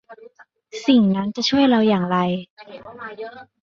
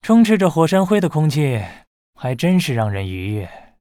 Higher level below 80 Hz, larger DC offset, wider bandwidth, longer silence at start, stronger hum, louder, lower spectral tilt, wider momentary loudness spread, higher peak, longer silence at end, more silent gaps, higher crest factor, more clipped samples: second, -60 dBFS vs -52 dBFS; neither; second, 7.4 kHz vs 16 kHz; about the same, 0.1 s vs 0.05 s; neither; about the same, -18 LUFS vs -18 LUFS; about the same, -6 dB/octave vs -7 dB/octave; first, 21 LU vs 13 LU; about the same, -4 dBFS vs -2 dBFS; about the same, 0.2 s vs 0.2 s; second, 2.50-2.57 s vs 1.87-2.13 s; about the same, 16 dB vs 16 dB; neither